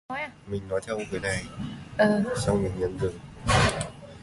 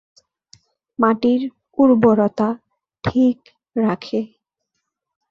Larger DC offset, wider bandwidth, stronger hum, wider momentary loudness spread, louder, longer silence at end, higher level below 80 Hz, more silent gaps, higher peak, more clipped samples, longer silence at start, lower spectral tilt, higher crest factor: neither; first, 11.5 kHz vs 6.8 kHz; neither; second, 12 LU vs 16 LU; second, -28 LUFS vs -18 LUFS; second, 0 s vs 1.05 s; first, -42 dBFS vs -54 dBFS; neither; second, -8 dBFS vs -2 dBFS; neither; second, 0.1 s vs 1 s; second, -5 dB/octave vs -8 dB/octave; about the same, 20 dB vs 18 dB